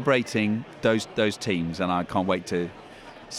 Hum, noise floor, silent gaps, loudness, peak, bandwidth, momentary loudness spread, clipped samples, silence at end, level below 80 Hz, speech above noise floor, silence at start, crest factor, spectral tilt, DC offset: none; -45 dBFS; none; -26 LUFS; -8 dBFS; 14.5 kHz; 13 LU; under 0.1%; 0 s; -56 dBFS; 19 dB; 0 s; 18 dB; -5.5 dB/octave; under 0.1%